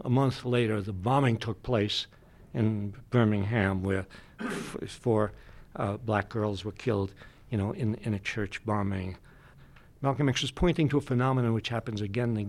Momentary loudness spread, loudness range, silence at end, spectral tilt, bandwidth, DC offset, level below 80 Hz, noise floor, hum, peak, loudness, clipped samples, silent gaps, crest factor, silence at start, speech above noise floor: 10 LU; 4 LU; 0 s; -6.5 dB/octave; 12 kHz; under 0.1%; -50 dBFS; -54 dBFS; none; -10 dBFS; -30 LUFS; under 0.1%; none; 18 dB; 0 s; 25 dB